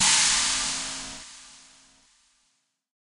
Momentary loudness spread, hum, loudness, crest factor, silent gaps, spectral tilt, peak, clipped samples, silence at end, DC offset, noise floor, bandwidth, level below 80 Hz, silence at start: 24 LU; none; -22 LUFS; 22 dB; none; 1.5 dB/octave; -6 dBFS; under 0.1%; 1.5 s; under 0.1%; -73 dBFS; 16 kHz; -54 dBFS; 0 s